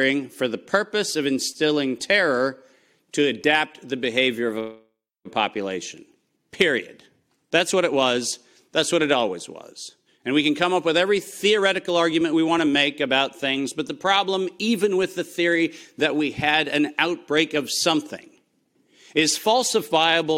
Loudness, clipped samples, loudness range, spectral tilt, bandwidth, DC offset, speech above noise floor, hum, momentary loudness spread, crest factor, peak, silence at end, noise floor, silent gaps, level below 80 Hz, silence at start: -22 LUFS; under 0.1%; 4 LU; -3 dB/octave; 16.5 kHz; under 0.1%; 44 dB; none; 9 LU; 20 dB; -4 dBFS; 0 s; -66 dBFS; none; -64 dBFS; 0 s